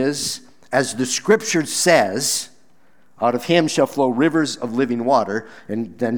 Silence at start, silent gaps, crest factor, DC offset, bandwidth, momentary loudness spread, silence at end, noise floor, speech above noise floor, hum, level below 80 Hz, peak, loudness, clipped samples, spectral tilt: 0 s; none; 18 dB; 0.4%; over 20 kHz; 11 LU; 0 s; -59 dBFS; 40 dB; none; -64 dBFS; 0 dBFS; -19 LUFS; under 0.1%; -3.5 dB/octave